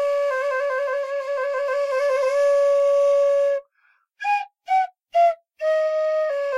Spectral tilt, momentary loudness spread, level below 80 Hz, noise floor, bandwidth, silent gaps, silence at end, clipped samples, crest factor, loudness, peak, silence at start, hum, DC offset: 1 dB/octave; 7 LU; -72 dBFS; -64 dBFS; 11.5 kHz; none; 0 s; under 0.1%; 10 dB; -21 LUFS; -10 dBFS; 0 s; none; under 0.1%